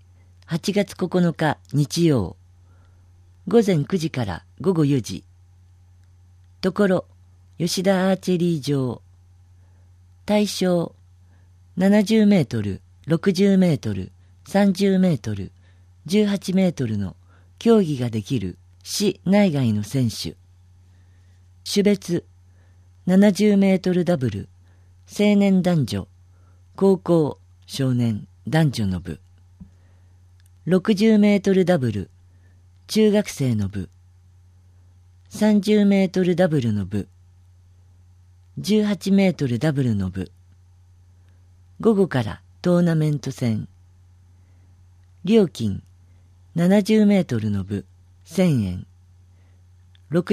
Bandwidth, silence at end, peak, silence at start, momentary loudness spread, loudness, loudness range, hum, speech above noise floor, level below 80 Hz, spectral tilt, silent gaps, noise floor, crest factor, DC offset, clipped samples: 14.5 kHz; 0 s; -4 dBFS; 0.5 s; 15 LU; -21 LUFS; 5 LU; none; 32 dB; -56 dBFS; -6.5 dB/octave; none; -51 dBFS; 18 dB; under 0.1%; under 0.1%